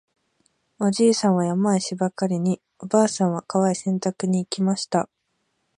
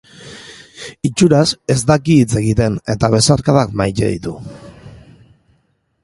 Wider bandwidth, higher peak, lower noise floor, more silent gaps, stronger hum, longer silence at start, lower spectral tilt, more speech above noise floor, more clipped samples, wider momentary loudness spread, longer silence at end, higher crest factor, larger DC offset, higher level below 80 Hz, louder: about the same, 11 kHz vs 11.5 kHz; second, -4 dBFS vs 0 dBFS; first, -73 dBFS vs -62 dBFS; neither; neither; first, 0.8 s vs 0.2 s; about the same, -5.5 dB/octave vs -5.5 dB/octave; about the same, 51 dB vs 48 dB; neither; second, 7 LU vs 22 LU; second, 0.75 s vs 1.1 s; about the same, 18 dB vs 16 dB; neither; second, -70 dBFS vs -38 dBFS; second, -22 LUFS vs -14 LUFS